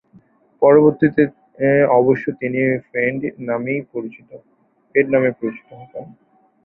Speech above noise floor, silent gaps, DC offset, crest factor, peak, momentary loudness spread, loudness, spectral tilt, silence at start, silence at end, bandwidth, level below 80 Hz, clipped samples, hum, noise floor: 35 dB; none; under 0.1%; 18 dB; 0 dBFS; 20 LU; -17 LUFS; -11.5 dB/octave; 0.6 s; 0.6 s; 4.1 kHz; -58 dBFS; under 0.1%; none; -52 dBFS